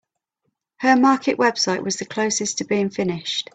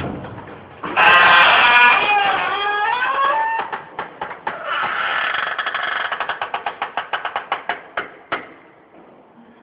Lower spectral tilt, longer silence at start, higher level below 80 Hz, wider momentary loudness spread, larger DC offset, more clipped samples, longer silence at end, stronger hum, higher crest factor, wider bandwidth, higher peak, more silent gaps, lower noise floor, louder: about the same, -3.5 dB/octave vs -4.5 dB/octave; first, 0.8 s vs 0 s; second, -64 dBFS vs -58 dBFS; second, 8 LU vs 19 LU; neither; neither; second, 0.15 s vs 1.1 s; neither; about the same, 20 dB vs 18 dB; first, 9.2 kHz vs 5.4 kHz; about the same, -2 dBFS vs 0 dBFS; neither; first, -75 dBFS vs -46 dBFS; second, -20 LUFS vs -16 LUFS